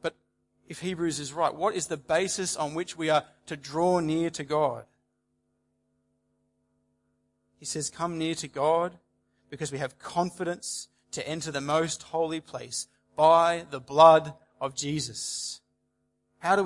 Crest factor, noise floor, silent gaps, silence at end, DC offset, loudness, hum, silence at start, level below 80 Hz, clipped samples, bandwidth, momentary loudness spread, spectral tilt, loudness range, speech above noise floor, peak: 24 dB; -76 dBFS; none; 0 s; under 0.1%; -27 LUFS; none; 0.05 s; -68 dBFS; under 0.1%; 11.5 kHz; 15 LU; -4 dB/octave; 12 LU; 49 dB; -4 dBFS